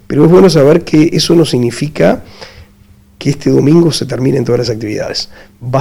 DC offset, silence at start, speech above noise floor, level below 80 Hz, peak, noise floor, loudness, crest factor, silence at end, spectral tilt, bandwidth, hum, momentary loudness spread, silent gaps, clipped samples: under 0.1%; 0.1 s; 33 dB; -38 dBFS; 0 dBFS; -42 dBFS; -10 LUFS; 10 dB; 0 s; -6.5 dB/octave; 16 kHz; none; 12 LU; none; 1%